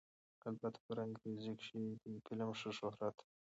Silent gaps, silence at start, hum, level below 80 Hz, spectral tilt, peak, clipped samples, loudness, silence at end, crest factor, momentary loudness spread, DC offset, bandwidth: 0.80-0.89 s; 0.45 s; none; -84 dBFS; -5.5 dB/octave; -30 dBFS; under 0.1%; -47 LUFS; 0.3 s; 18 dB; 6 LU; under 0.1%; 8 kHz